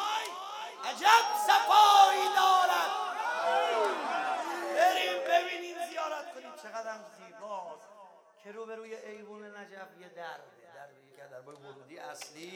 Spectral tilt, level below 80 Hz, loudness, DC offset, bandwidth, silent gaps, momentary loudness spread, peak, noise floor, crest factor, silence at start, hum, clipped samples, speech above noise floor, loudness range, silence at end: -0.5 dB/octave; under -90 dBFS; -27 LUFS; under 0.1%; 18.5 kHz; none; 24 LU; -8 dBFS; -56 dBFS; 22 dB; 0 s; none; under 0.1%; 25 dB; 22 LU; 0 s